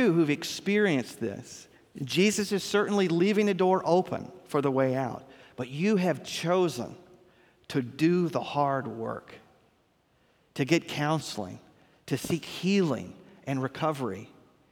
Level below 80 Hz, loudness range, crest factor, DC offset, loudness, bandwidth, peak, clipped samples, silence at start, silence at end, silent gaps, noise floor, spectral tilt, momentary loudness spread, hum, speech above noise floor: -68 dBFS; 5 LU; 20 dB; under 0.1%; -28 LUFS; 18.5 kHz; -8 dBFS; under 0.1%; 0 s; 0.45 s; none; -68 dBFS; -5.5 dB/octave; 17 LU; none; 40 dB